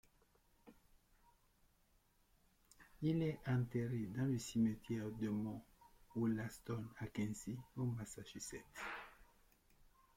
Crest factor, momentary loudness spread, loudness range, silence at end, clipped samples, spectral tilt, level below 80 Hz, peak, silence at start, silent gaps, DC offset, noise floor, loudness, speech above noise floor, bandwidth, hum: 18 dB; 11 LU; 6 LU; 0.35 s; under 0.1%; -6.5 dB/octave; -68 dBFS; -28 dBFS; 0.65 s; none; under 0.1%; -76 dBFS; -43 LUFS; 34 dB; 16.5 kHz; none